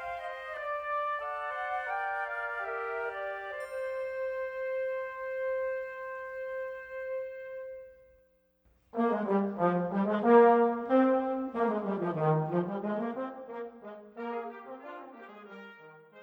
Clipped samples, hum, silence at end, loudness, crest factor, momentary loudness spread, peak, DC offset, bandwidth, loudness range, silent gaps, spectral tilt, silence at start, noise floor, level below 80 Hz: under 0.1%; none; 0 s; -31 LUFS; 24 dB; 18 LU; -8 dBFS; under 0.1%; 9.4 kHz; 11 LU; none; -8.5 dB/octave; 0 s; -68 dBFS; -70 dBFS